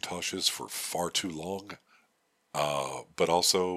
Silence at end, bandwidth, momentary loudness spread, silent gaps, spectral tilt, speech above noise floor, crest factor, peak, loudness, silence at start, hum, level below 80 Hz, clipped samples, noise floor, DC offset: 0 s; 15.5 kHz; 14 LU; none; -2 dB/octave; 42 dB; 20 dB; -10 dBFS; -30 LUFS; 0.05 s; none; -66 dBFS; under 0.1%; -73 dBFS; under 0.1%